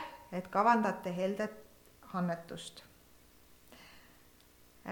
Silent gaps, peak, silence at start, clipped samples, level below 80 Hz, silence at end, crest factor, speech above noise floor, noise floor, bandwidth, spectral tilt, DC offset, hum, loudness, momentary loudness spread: none; -14 dBFS; 0 s; under 0.1%; -70 dBFS; 0 s; 24 dB; 29 dB; -62 dBFS; 19 kHz; -6 dB/octave; under 0.1%; 60 Hz at -60 dBFS; -34 LUFS; 27 LU